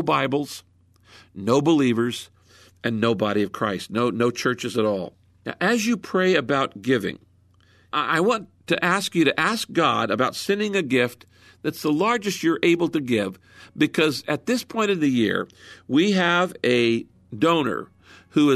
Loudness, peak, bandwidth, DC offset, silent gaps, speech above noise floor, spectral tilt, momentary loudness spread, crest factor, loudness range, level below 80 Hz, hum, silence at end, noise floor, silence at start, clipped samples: -22 LUFS; -6 dBFS; 13.5 kHz; under 0.1%; none; 35 dB; -5 dB/octave; 10 LU; 18 dB; 2 LU; -64 dBFS; none; 0 s; -57 dBFS; 0 s; under 0.1%